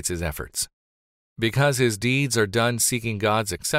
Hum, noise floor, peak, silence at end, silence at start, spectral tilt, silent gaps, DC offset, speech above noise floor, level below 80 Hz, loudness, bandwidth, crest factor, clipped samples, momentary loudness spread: none; under -90 dBFS; -8 dBFS; 0 s; 0 s; -4 dB/octave; 0.73-1.36 s; under 0.1%; over 67 dB; -46 dBFS; -23 LUFS; 16 kHz; 16 dB; under 0.1%; 8 LU